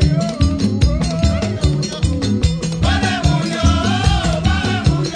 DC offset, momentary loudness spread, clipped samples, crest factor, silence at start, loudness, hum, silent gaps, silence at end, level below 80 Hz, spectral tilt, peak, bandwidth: under 0.1%; 3 LU; under 0.1%; 14 dB; 0 s; -17 LUFS; none; none; 0 s; -22 dBFS; -5.5 dB/octave; -2 dBFS; 10 kHz